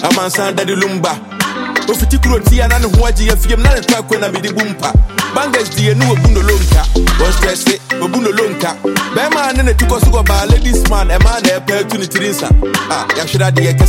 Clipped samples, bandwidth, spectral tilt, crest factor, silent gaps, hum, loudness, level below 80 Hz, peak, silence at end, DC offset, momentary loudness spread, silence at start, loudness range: under 0.1%; 17 kHz; -4.5 dB/octave; 10 dB; none; none; -12 LUFS; -14 dBFS; 0 dBFS; 0 s; under 0.1%; 5 LU; 0 s; 1 LU